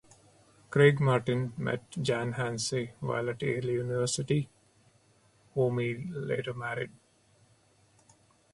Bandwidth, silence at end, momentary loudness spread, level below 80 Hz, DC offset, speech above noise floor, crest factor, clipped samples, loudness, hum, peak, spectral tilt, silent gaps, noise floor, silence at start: 11.5 kHz; 1.65 s; 12 LU; -64 dBFS; under 0.1%; 36 dB; 22 dB; under 0.1%; -30 LUFS; none; -8 dBFS; -5.5 dB/octave; none; -65 dBFS; 0.7 s